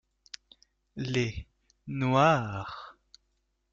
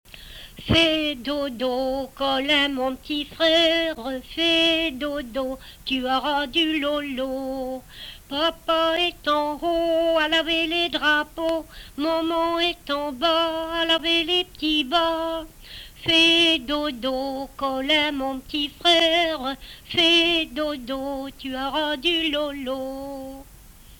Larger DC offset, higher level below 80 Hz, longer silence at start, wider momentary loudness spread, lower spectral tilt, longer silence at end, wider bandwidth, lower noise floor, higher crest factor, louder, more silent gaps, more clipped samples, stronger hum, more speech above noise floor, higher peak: neither; second, -56 dBFS vs -48 dBFS; first, 0.95 s vs 0.15 s; first, 24 LU vs 14 LU; first, -6 dB/octave vs -3.5 dB/octave; first, 0.8 s vs 0.05 s; second, 7.6 kHz vs 19.5 kHz; first, -76 dBFS vs -47 dBFS; about the same, 20 dB vs 18 dB; second, -28 LUFS vs -22 LUFS; neither; neither; neither; first, 48 dB vs 23 dB; second, -12 dBFS vs -6 dBFS